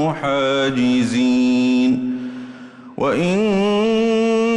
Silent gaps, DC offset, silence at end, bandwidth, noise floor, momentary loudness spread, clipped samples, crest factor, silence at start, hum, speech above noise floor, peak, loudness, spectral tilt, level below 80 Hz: none; under 0.1%; 0 s; 10.5 kHz; -37 dBFS; 14 LU; under 0.1%; 8 dB; 0 s; none; 21 dB; -8 dBFS; -17 LUFS; -6 dB/octave; -52 dBFS